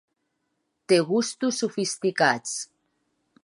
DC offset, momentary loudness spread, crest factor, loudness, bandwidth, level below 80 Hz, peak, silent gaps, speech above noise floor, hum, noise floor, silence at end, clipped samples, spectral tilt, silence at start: under 0.1%; 11 LU; 20 dB; -24 LUFS; 11.5 kHz; -80 dBFS; -6 dBFS; none; 52 dB; none; -76 dBFS; 0.8 s; under 0.1%; -3.5 dB/octave; 0.9 s